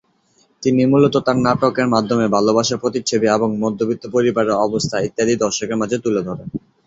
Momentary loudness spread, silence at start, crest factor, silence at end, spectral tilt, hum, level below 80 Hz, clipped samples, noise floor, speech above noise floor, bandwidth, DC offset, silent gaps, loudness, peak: 6 LU; 0.6 s; 16 dB; 0.3 s; -5 dB/octave; none; -52 dBFS; under 0.1%; -59 dBFS; 42 dB; 8 kHz; under 0.1%; none; -17 LUFS; -2 dBFS